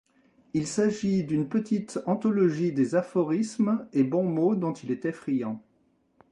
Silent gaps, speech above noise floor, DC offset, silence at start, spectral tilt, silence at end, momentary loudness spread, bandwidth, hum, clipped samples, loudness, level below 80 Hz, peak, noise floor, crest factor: none; 42 dB; under 0.1%; 0.55 s; -7 dB/octave; 0.7 s; 7 LU; 11 kHz; none; under 0.1%; -27 LUFS; -66 dBFS; -10 dBFS; -68 dBFS; 16 dB